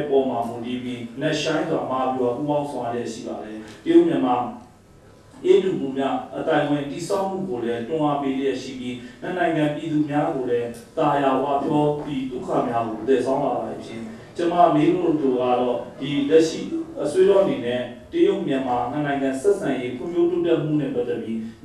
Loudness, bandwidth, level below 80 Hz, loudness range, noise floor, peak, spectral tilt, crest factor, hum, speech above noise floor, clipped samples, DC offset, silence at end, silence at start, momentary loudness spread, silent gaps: -22 LUFS; 12 kHz; -56 dBFS; 3 LU; -49 dBFS; -4 dBFS; -6.5 dB/octave; 18 dB; none; 27 dB; under 0.1%; under 0.1%; 0.1 s; 0 s; 11 LU; none